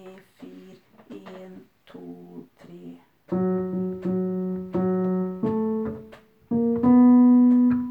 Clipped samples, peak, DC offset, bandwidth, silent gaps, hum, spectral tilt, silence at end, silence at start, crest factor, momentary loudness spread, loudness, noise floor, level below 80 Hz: under 0.1%; -10 dBFS; under 0.1%; 3.2 kHz; none; none; -11 dB/octave; 0 s; 0.05 s; 14 dB; 27 LU; -22 LUFS; -50 dBFS; -60 dBFS